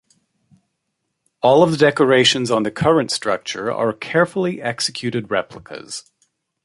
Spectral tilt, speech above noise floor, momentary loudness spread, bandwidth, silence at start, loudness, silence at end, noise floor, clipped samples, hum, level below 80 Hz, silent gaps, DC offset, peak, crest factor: -4.5 dB/octave; 57 dB; 17 LU; 11.5 kHz; 1.45 s; -18 LUFS; 0.65 s; -75 dBFS; under 0.1%; none; -56 dBFS; none; under 0.1%; -2 dBFS; 18 dB